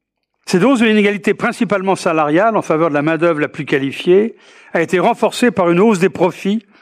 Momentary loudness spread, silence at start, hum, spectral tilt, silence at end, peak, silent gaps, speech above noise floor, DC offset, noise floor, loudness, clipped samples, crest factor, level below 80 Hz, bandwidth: 7 LU; 0.45 s; none; -6 dB/octave; 0.2 s; -2 dBFS; none; 23 dB; under 0.1%; -37 dBFS; -15 LUFS; under 0.1%; 12 dB; -60 dBFS; 14.5 kHz